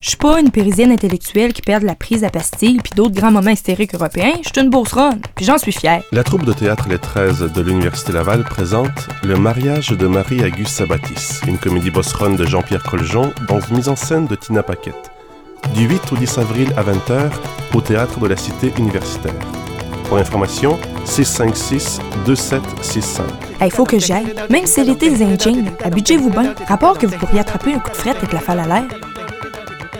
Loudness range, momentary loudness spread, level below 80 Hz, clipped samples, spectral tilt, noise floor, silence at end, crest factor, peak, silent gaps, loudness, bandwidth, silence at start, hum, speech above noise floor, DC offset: 4 LU; 8 LU; -32 dBFS; under 0.1%; -5 dB/octave; -38 dBFS; 0 s; 14 dB; 0 dBFS; none; -15 LUFS; 19 kHz; 0 s; none; 23 dB; 0.2%